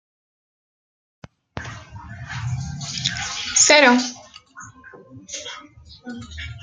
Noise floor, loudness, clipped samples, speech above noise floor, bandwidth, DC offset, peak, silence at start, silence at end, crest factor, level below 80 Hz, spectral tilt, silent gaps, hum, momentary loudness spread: -44 dBFS; -17 LUFS; under 0.1%; 26 dB; 10.5 kHz; under 0.1%; -2 dBFS; 1.55 s; 0 s; 22 dB; -50 dBFS; -2 dB/octave; none; none; 27 LU